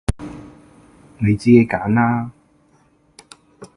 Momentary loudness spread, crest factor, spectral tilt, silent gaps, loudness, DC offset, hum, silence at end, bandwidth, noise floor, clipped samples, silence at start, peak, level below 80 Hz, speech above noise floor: 21 LU; 20 dB; -8 dB/octave; none; -17 LUFS; under 0.1%; none; 0.1 s; 11.5 kHz; -57 dBFS; under 0.1%; 0.1 s; 0 dBFS; -38 dBFS; 42 dB